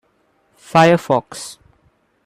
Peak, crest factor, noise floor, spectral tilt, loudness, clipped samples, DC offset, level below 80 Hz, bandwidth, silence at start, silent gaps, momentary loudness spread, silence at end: 0 dBFS; 18 dB; -61 dBFS; -5.5 dB/octave; -15 LUFS; under 0.1%; under 0.1%; -60 dBFS; 14.5 kHz; 0.75 s; none; 19 LU; 0.75 s